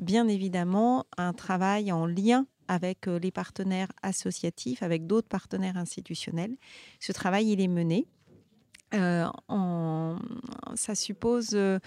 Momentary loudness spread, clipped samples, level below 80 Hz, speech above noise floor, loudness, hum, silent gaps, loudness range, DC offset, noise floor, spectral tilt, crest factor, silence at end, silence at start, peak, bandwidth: 10 LU; under 0.1%; -68 dBFS; 32 dB; -29 LUFS; none; none; 4 LU; under 0.1%; -61 dBFS; -5.5 dB/octave; 16 dB; 0.05 s; 0 s; -12 dBFS; 13 kHz